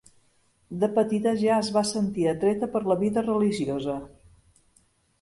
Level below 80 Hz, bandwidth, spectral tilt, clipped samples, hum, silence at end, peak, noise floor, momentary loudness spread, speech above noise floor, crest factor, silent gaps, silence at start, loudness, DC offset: -58 dBFS; 11.5 kHz; -6 dB/octave; under 0.1%; none; 1.15 s; -10 dBFS; -65 dBFS; 6 LU; 41 dB; 16 dB; none; 0.7 s; -25 LUFS; under 0.1%